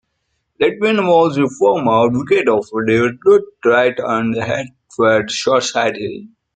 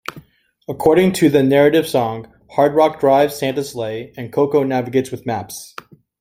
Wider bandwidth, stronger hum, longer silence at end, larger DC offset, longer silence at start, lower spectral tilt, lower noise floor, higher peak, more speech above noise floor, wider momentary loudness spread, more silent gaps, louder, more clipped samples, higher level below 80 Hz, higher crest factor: second, 9.2 kHz vs 16.5 kHz; neither; second, 0.3 s vs 0.55 s; neither; first, 0.6 s vs 0.15 s; about the same, -5 dB/octave vs -6 dB/octave; first, -70 dBFS vs -45 dBFS; about the same, 0 dBFS vs 0 dBFS; first, 55 dB vs 29 dB; second, 7 LU vs 18 LU; neither; about the same, -15 LUFS vs -16 LUFS; neither; about the same, -56 dBFS vs -52 dBFS; about the same, 16 dB vs 16 dB